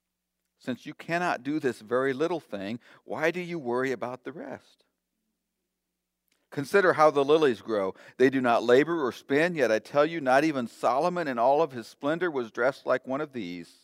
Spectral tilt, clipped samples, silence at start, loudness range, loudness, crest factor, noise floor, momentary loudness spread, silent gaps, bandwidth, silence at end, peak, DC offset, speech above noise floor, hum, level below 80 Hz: -5.5 dB/octave; under 0.1%; 0.65 s; 10 LU; -26 LUFS; 20 dB; -83 dBFS; 15 LU; none; 15.5 kHz; 0.2 s; -6 dBFS; under 0.1%; 57 dB; none; -80 dBFS